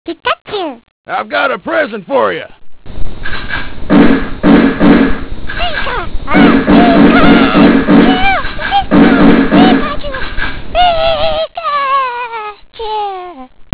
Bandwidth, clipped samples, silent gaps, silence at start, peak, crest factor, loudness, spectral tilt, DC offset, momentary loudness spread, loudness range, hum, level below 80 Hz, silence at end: 4 kHz; 2%; 0.41-0.45 s, 0.91-1.04 s; 0.05 s; 0 dBFS; 10 dB; -10 LUFS; -10 dB/octave; under 0.1%; 16 LU; 7 LU; none; -26 dBFS; 0.15 s